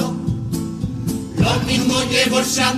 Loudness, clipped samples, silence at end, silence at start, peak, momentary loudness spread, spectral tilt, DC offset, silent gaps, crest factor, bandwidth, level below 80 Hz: -19 LUFS; under 0.1%; 0 s; 0 s; -4 dBFS; 9 LU; -4 dB/octave; under 0.1%; none; 16 dB; 15.5 kHz; -38 dBFS